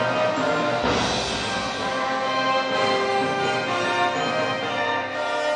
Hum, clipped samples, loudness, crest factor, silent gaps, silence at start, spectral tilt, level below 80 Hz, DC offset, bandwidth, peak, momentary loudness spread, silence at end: none; under 0.1%; -23 LUFS; 14 dB; none; 0 s; -3.5 dB/octave; -50 dBFS; under 0.1%; 11 kHz; -8 dBFS; 3 LU; 0 s